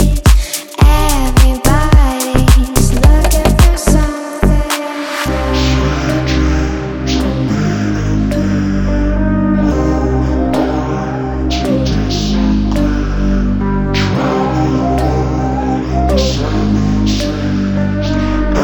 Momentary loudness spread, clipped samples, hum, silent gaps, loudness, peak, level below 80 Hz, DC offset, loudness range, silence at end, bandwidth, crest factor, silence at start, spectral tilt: 6 LU; under 0.1%; none; none; -14 LUFS; 0 dBFS; -14 dBFS; under 0.1%; 4 LU; 0 s; 18.5 kHz; 12 dB; 0 s; -6 dB/octave